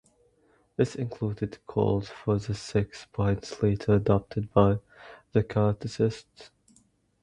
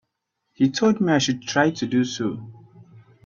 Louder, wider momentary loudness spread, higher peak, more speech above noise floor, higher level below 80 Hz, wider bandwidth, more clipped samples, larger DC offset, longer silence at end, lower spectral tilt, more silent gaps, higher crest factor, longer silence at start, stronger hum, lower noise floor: second, -28 LUFS vs -22 LUFS; about the same, 9 LU vs 9 LU; about the same, -6 dBFS vs -4 dBFS; second, 39 dB vs 56 dB; first, -48 dBFS vs -62 dBFS; first, 10 kHz vs 7.2 kHz; neither; neither; first, 0.75 s vs 0.25 s; first, -7.5 dB/octave vs -5 dB/octave; neither; about the same, 22 dB vs 20 dB; first, 0.8 s vs 0.6 s; neither; second, -65 dBFS vs -77 dBFS